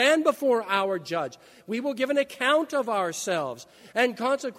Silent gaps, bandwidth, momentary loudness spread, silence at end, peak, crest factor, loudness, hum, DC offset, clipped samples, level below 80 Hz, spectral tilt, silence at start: none; 16 kHz; 9 LU; 0.05 s; -8 dBFS; 18 dB; -26 LUFS; none; under 0.1%; under 0.1%; -76 dBFS; -3 dB/octave; 0 s